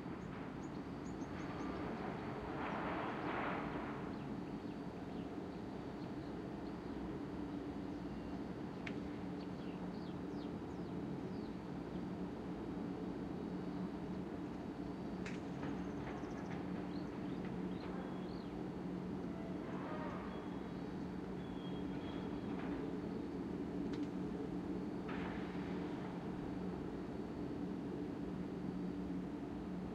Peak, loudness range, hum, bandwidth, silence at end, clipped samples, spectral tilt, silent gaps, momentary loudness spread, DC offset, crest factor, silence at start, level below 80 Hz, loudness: -28 dBFS; 2 LU; none; 11 kHz; 0 s; under 0.1%; -7.5 dB/octave; none; 4 LU; under 0.1%; 16 dB; 0 s; -60 dBFS; -45 LUFS